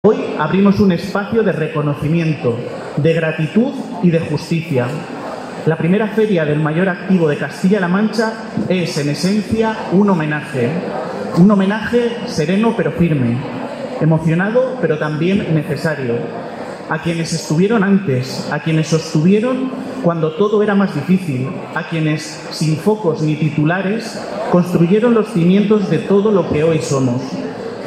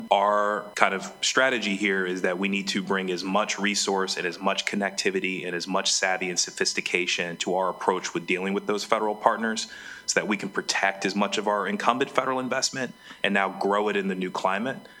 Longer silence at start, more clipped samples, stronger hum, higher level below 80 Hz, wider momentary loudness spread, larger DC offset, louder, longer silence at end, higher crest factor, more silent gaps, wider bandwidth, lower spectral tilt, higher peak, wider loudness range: about the same, 0.05 s vs 0 s; neither; neither; first, -50 dBFS vs -70 dBFS; first, 9 LU vs 5 LU; neither; first, -16 LUFS vs -25 LUFS; about the same, 0 s vs 0 s; second, 14 dB vs 24 dB; neither; second, 13.5 kHz vs 19 kHz; first, -7 dB/octave vs -3 dB/octave; about the same, 0 dBFS vs 0 dBFS; about the same, 3 LU vs 1 LU